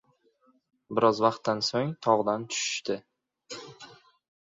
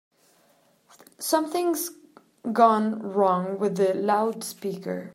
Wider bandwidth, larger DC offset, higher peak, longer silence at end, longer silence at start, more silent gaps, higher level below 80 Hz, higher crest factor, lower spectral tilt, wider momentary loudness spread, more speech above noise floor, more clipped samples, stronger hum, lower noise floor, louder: second, 7.8 kHz vs 16 kHz; neither; second, -8 dBFS vs -4 dBFS; first, 0.65 s vs 0.05 s; second, 0.9 s vs 1.2 s; neither; first, -72 dBFS vs -80 dBFS; about the same, 22 dB vs 22 dB; about the same, -4 dB/octave vs -5 dB/octave; first, 18 LU vs 13 LU; about the same, 40 dB vs 39 dB; neither; neither; first, -67 dBFS vs -63 dBFS; about the same, -27 LUFS vs -25 LUFS